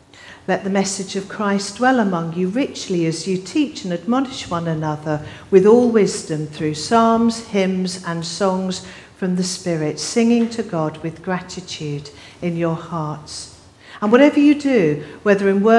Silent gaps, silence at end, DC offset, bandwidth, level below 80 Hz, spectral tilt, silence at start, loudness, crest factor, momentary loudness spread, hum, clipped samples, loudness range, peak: none; 0 s; under 0.1%; 12 kHz; -56 dBFS; -5.5 dB/octave; 0.2 s; -19 LUFS; 18 dB; 13 LU; none; under 0.1%; 5 LU; 0 dBFS